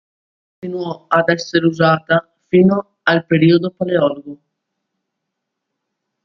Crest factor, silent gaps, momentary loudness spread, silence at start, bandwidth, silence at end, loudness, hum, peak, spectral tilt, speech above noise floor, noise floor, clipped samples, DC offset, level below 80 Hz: 18 dB; none; 12 LU; 0.65 s; 7.2 kHz; 1.9 s; -16 LUFS; none; 0 dBFS; -7 dB/octave; 63 dB; -78 dBFS; under 0.1%; under 0.1%; -60 dBFS